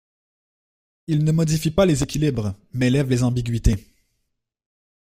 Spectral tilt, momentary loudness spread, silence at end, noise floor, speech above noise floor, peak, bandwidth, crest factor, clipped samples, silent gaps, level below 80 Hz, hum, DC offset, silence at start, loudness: -6.5 dB/octave; 9 LU; 1.2 s; -76 dBFS; 56 dB; -2 dBFS; 15.5 kHz; 20 dB; under 0.1%; none; -34 dBFS; none; under 0.1%; 1.1 s; -21 LUFS